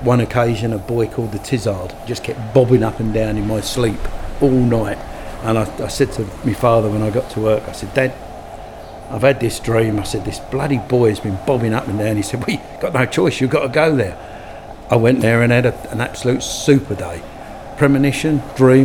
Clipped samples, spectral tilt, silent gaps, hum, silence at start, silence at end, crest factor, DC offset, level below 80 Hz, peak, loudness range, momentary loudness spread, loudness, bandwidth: under 0.1%; -6.5 dB/octave; none; none; 0 s; 0 s; 16 dB; under 0.1%; -36 dBFS; 0 dBFS; 3 LU; 14 LU; -17 LUFS; 17 kHz